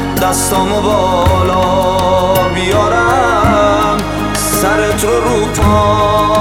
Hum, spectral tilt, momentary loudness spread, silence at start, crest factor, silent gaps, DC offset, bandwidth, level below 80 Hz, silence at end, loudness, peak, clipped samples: none; -4.5 dB/octave; 3 LU; 0 s; 10 dB; none; 0.2%; 19 kHz; -26 dBFS; 0 s; -11 LUFS; 0 dBFS; under 0.1%